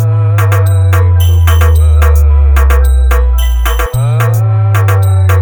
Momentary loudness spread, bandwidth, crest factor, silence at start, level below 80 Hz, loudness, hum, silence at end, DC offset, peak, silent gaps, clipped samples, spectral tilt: 4 LU; over 20 kHz; 6 dB; 0 s; -12 dBFS; -9 LUFS; none; 0 s; under 0.1%; 0 dBFS; none; 0.1%; -6 dB/octave